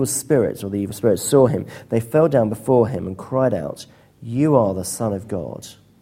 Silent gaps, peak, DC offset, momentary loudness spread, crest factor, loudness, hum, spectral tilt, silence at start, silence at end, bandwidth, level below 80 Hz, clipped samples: none; -2 dBFS; under 0.1%; 14 LU; 18 dB; -20 LUFS; none; -6 dB/octave; 0 s; 0.3 s; 16.5 kHz; -52 dBFS; under 0.1%